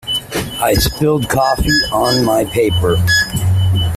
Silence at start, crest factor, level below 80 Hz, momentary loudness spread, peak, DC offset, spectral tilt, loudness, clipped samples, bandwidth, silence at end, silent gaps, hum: 0.05 s; 12 dB; -28 dBFS; 4 LU; -2 dBFS; under 0.1%; -4.5 dB/octave; -14 LUFS; under 0.1%; 16 kHz; 0 s; none; none